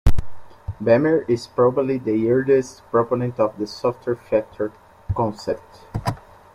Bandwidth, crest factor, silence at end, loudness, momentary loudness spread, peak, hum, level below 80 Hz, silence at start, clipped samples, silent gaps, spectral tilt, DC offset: 13.5 kHz; 18 dB; 0.4 s; -22 LUFS; 12 LU; -2 dBFS; none; -34 dBFS; 0.05 s; under 0.1%; none; -7.5 dB/octave; under 0.1%